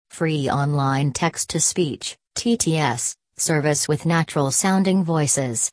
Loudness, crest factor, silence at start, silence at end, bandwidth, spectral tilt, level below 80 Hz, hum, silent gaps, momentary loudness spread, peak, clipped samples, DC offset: -21 LUFS; 16 dB; 0.15 s; 0.05 s; 11 kHz; -4 dB/octave; -56 dBFS; none; none; 6 LU; -4 dBFS; under 0.1%; under 0.1%